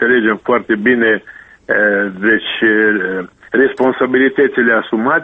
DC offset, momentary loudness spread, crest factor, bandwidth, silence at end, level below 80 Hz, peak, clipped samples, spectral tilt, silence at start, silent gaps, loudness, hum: under 0.1%; 6 LU; 14 dB; 4.1 kHz; 0 s; -54 dBFS; 0 dBFS; under 0.1%; -7.5 dB/octave; 0 s; none; -13 LUFS; none